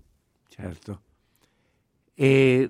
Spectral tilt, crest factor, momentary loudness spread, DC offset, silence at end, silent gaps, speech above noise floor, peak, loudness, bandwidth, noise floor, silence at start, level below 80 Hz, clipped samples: -7.5 dB/octave; 20 dB; 23 LU; under 0.1%; 0 s; none; 48 dB; -6 dBFS; -20 LUFS; 12 kHz; -69 dBFS; 0.6 s; -60 dBFS; under 0.1%